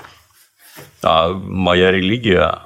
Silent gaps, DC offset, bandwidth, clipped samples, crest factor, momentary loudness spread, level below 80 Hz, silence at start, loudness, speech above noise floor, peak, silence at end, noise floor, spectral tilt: none; under 0.1%; 15.5 kHz; under 0.1%; 16 dB; 7 LU; -46 dBFS; 0.75 s; -15 LUFS; 37 dB; 0 dBFS; 0.05 s; -51 dBFS; -6 dB/octave